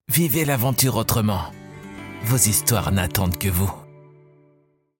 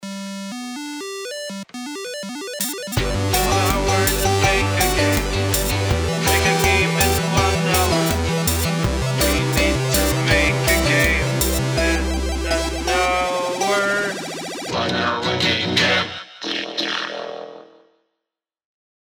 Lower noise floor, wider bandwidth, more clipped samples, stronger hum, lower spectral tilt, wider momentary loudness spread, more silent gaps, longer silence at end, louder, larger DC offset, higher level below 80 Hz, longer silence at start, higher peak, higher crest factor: second, -61 dBFS vs -83 dBFS; second, 17 kHz vs over 20 kHz; neither; neither; about the same, -4 dB/octave vs -4 dB/octave; first, 20 LU vs 13 LU; neither; second, 1.1 s vs 1.5 s; about the same, -20 LUFS vs -19 LUFS; neither; second, -44 dBFS vs -30 dBFS; about the same, 0.1 s vs 0 s; about the same, -2 dBFS vs -4 dBFS; about the same, 20 dB vs 16 dB